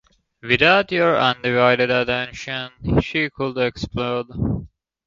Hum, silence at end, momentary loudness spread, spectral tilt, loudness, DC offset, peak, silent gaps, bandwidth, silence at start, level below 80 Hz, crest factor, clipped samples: none; 0.4 s; 12 LU; -6 dB/octave; -19 LUFS; under 0.1%; 0 dBFS; none; 7.6 kHz; 0.45 s; -40 dBFS; 20 dB; under 0.1%